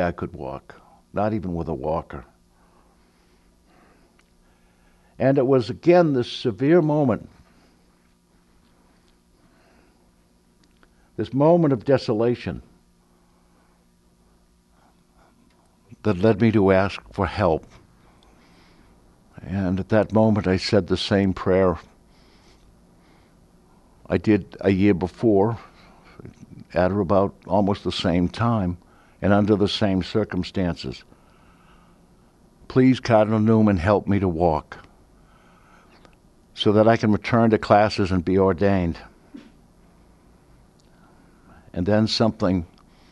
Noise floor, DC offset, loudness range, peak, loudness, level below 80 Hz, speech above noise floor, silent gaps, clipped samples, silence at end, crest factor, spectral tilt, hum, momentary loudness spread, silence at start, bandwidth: -59 dBFS; under 0.1%; 9 LU; 0 dBFS; -21 LUFS; -48 dBFS; 39 dB; none; under 0.1%; 0.45 s; 22 dB; -7.5 dB/octave; none; 15 LU; 0 s; 10.5 kHz